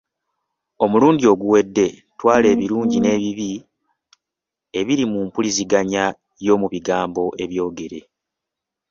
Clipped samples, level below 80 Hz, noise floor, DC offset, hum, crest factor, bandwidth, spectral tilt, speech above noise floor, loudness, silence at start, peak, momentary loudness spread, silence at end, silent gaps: under 0.1%; -56 dBFS; -85 dBFS; under 0.1%; none; 18 dB; 7.6 kHz; -5 dB/octave; 67 dB; -18 LUFS; 0.8 s; -2 dBFS; 12 LU; 0.9 s; none